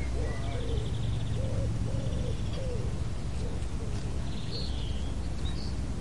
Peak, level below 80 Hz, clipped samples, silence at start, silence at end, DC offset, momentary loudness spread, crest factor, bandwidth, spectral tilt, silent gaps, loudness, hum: -18 dBFS; -36 dBFS; under 0.1%; 0 s; 0 s; 2%; 4 LU; 12 dB; 11.5 kHz; -6.5 dB/octave; none; -34 LUFS; none